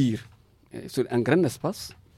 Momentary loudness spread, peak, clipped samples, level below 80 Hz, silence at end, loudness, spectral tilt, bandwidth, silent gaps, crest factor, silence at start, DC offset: 17 LU; -8 dBFS; under 0.1%; -60 dBFS; 0.25 s; -26 LUFS; -6.5 dB/octave; 16 kHz; none; 18 dB; 0 s; under 0.1%